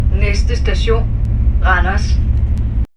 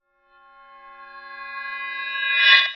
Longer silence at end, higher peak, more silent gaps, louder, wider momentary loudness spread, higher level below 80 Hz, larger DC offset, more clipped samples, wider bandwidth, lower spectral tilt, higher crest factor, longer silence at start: about the same, 0.1 s vs 0 s; about the same, 0 dBFS vs -2 dBFS; neither; first, -16 LUFS vs -19 LUFS; second, 4 LU vs 27 LU; first, -14 dBFS vs -72 dBFS; neither; neither; first, 8.2 kHz vs 6.8 kHz; first, -6.5 dB/octave vs 2 dB/octave; second, 12 dB vs 22 dB; second, 0 s vs 0.85 s